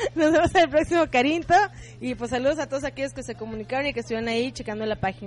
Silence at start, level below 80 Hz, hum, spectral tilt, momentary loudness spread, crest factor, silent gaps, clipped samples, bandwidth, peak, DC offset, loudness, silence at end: 0 s; -46 dBFS; none; -5 dB/octave; 12 LU; 16 dB; none; under 0.1%; 11.5 kHz; -8 dBFS; under 0.1%; -24 LUFS; 0 s